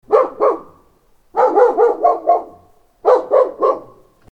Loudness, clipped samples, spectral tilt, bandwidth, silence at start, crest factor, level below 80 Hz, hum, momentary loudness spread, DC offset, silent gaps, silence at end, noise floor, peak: -15 LUFS; under 0.1%; -6 dB/octave; 7 kHz; 0.1 s; 16 dB; -58 dBFS; none; 8 LU; under 0.1%; none; 0.5 s; -54 dBFS; 0 dBFS